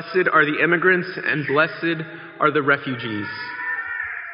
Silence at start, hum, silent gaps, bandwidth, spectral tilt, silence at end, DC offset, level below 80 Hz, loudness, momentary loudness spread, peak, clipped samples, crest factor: 0 s; none; none; 5.6 kHz; -3.5 dB/octave; 0 s; under 0.1%; -68 dBFS; -20 LUFS; 11 LU; -4 dBFS; under 0.1%; 18 dB